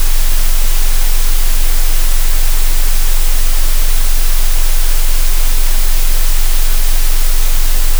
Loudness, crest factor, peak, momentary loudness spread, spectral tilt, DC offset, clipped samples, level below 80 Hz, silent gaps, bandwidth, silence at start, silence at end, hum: -16 LUFS; 6 dB; 0 dBFS; 0 LU; -2 dB/octave; under 0.1%; under 0.1%; -8 dBFS; none; over 20 kHz; 0 s; 0 s; none